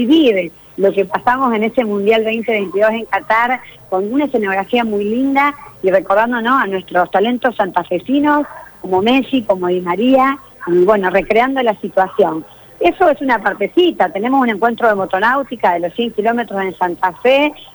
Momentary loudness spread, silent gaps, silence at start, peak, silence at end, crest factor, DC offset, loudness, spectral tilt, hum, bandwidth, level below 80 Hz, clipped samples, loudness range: 6 LU; none; 0 s; -2 dBFS; 0.1 s; 12 dB; under 0.1%; -15 LUFS; -6.5 dB/octave; none; over 20 kHz; -50 dBFS; under 0.1%; 1 LU